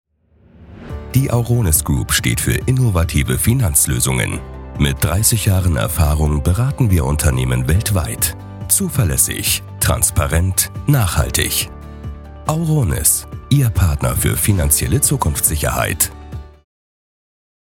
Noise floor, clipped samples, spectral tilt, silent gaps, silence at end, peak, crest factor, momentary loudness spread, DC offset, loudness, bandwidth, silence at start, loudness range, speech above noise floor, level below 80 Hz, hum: -52 dBFS; under 0.1%; -4 dB/octave; none; 1.3 s; 0 dBFS; 16 dB; 7 LU; under 0.1%; -16 LUFS; 19 kHz; 0.6 s; 2 LU; 36 dB; -28 dBFS; none